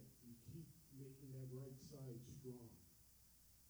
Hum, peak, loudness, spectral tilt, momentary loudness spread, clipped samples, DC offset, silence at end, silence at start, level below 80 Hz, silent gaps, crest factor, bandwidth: none; -44 dBFS; -58 LUFS; -6.5 dB/octave; 13 LU; under 0.1%; under 0.1%; 0 s; 0 s; -76 dBFS; none; 14 dB; over 20 kHz